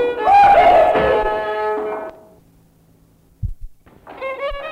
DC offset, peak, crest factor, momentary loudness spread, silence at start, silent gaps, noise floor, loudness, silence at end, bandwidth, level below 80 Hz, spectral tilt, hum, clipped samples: under 0.1%; -4 dBFS; 12 dB; 21 LU; 0 s; none; -53 dBFS; -14 LUFS; 0 s; 9.6 kHz; -38 dBFS; -6 dB/octave; none; under 0.1%